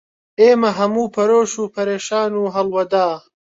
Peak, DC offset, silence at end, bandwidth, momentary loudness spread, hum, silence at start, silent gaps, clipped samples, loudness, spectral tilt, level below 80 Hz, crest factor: -2 dBFS; under 0.1%; 0.35 s; 8 kHz; 9 LU; none; 0.4 s; none; under 0.1%; -17 LUFS; -4.5 dB/octave; -64 dBFS; 14 dB